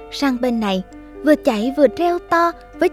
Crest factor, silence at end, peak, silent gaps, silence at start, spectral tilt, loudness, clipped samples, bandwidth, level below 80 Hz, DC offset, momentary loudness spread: 18 dB; 0 s; 0 dBFS; none; 0 s; -5.5 dB/octave; -18 LUFS; under 0.1%; 16 kHz; -46 dBFS; under 0.1%; 6 LU